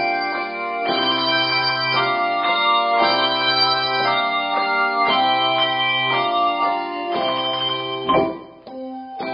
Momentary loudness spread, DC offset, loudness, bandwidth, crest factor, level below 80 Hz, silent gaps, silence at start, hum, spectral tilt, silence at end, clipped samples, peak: 8 LU; under 0.1%; -18 LUFS; 5.4 kHz; 16 dB; -60 dBFS; none; 0 s; none; -8 dB/octave; 0 s; under 0.1%; -4 dBFS